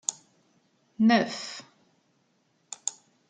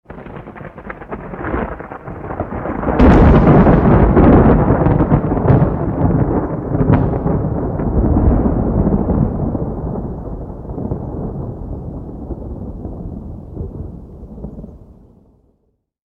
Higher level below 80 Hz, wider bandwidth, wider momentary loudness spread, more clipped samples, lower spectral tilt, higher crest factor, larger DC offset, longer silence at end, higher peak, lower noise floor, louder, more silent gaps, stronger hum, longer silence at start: second, -82 dBFS vs -22 dBFS; first, 9.6 kHz vs 5.2 kHz; second, 19 LU vs 22 LU; neither; second, -3.5 dB/octave vs -11 dB/octave; first, 24 dB vs 14 dB; neither; second, 0.4 s vs 1.35 s; second, -8 dBFS vs 0 dBFS; first, -70 dBFS vs -64 dBFS; second, -27 LUFS vs -14 LUFS; neither; neither; about the same, 0.1 s vs 0.1 s